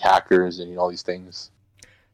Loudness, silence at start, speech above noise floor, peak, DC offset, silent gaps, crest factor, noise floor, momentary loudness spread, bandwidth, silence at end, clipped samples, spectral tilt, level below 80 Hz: -22 LUFS; 0 s; 33 dB; -8 dBFS; under 0.1%; none; 16 dB; -54 dBFS; 20 LU; 11.5 kHz; 0.7 s; under 0.1%; -5 dB/octave; -60 dBFS